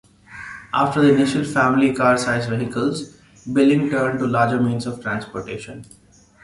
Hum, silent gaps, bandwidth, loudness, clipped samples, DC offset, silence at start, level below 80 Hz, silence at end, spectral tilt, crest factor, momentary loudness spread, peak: none; none; 11.5 kHz; -19 LUFS; under 0.1%; under 0.1%; 0.3 s; -54 dBFS; 0.6 s; -6 dB/octave; 16 dB; 19 LU; -4 dBFS